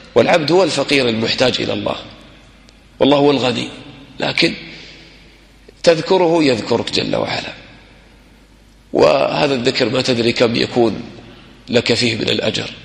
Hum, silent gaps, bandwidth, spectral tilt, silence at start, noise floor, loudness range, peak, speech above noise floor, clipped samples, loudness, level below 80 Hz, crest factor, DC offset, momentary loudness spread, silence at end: none; none; 11.5 kHz; -4.5 dB/octave; 0.15 s; -46 dBFS; 2 LU; 0 dBFS; 31 dB; under 0.1%; -15 LUFS; -48 dBFS; 16 dB; under 0.1%; 16 LU; 0 s